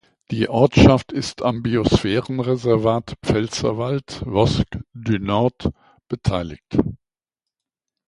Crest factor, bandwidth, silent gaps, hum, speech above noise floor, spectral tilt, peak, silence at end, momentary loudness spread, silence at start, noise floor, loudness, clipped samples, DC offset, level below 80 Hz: 20 dB; 11.5 kHz; none; none; 68 dB; -6.5 dB/octave; 0 dBFS; 1.15 s; 12 LU; 0.3 s; -87 dBFS; -20 LUFS; under 0.1%; under 0.1%; -36 dBFS